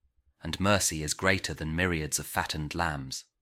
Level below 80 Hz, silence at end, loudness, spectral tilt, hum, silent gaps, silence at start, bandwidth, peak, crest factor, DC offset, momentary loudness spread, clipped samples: -48 dBFS; 0.2 s; -29 LUFS; -3.5 dB/octave; none; none; 0.45 s; 16.5 kHz; -8 dBFS; 22 dB; under 0.1%; 11 LU; under 0.1%